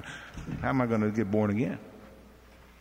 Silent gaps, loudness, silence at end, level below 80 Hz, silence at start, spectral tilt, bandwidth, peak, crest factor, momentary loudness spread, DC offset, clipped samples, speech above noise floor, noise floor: none; -29 LUFS; 0.25 s; -52 dBFS; 0 s; -8 dB/octave; 15.5 kHz; -12 dBFS; 18 dB; 15 LU; under 0.1%; under 0.1%; 26 dB; -54 dBFS